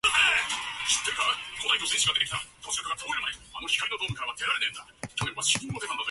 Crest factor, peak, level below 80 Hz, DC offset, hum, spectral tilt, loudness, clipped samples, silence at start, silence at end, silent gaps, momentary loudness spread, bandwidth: 18 dB; -10 dBFS; -58 dBFS; under 0.1%; none; -0.5 dB/octave; -27 LUFS; under 0.1%; 0.05 s; 0 s; none; 10 LU; 12 kHz